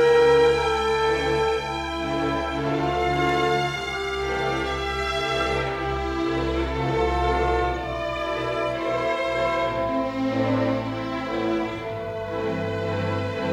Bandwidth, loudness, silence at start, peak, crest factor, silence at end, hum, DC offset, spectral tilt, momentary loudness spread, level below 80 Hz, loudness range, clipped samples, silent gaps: 13 kHz; -24 LUFS; 0 s; -8 dBFS; 14 dB; 0 s; none; under 0.1%; -5.5 dB/octave; 6 LU; -38 dBFS; 2 LU; under 0.1%; none